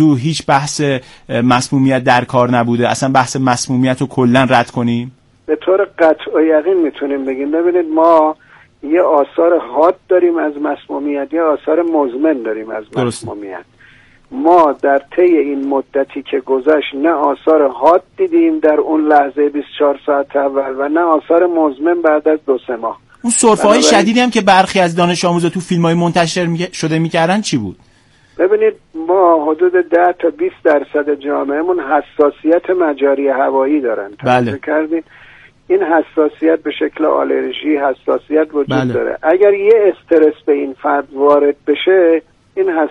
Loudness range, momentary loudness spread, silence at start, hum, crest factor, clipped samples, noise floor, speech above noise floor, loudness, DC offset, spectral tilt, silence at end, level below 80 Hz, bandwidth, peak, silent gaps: 4 LU; 9 LU; 0 s; none; 14 dB; under 0.1%; -48 dBFS; 35 dB; -13 LUFS; under 0.1%; -5 dB/octave; 0 s; -52 dBFS; 11.5 kHz; 0 dBFS; none